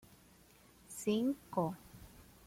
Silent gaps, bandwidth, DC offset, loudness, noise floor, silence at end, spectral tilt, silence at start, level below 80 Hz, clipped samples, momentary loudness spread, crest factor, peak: none; 16.5 kHz; under 0.1%; -37 LUFS; -64 dBFS; 0.25 s; -6 dB/octave; 0.9 s; -68 dBFS; under 0.1%; 22 LU; 20 dB; -22 dBFS